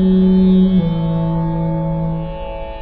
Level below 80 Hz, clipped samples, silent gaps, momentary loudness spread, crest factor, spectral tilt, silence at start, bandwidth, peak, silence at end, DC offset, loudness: -28 dBFS; under 0.1%; none; 14 LU; 10 dB; -12 dB/octave; 0 s; 4.4 kHz; -4 dBFS; 0 s; under 0.1%; -15 LUFS